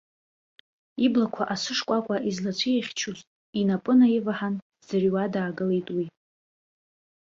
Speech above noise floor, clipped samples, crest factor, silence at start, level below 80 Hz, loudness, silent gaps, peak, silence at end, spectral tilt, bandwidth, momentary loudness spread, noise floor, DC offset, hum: over 65 dB; under 0.1%; 16 dB; 0.95 s; -68 dBFS; -26 LUFS; 3.27-3.53 s, 4.62-4.70 s; -10 dBFS; 1.1 s; -5.5 dB/octave; 7.6 kHz; 12 LU; under -90 dBFS; under 0.1%; none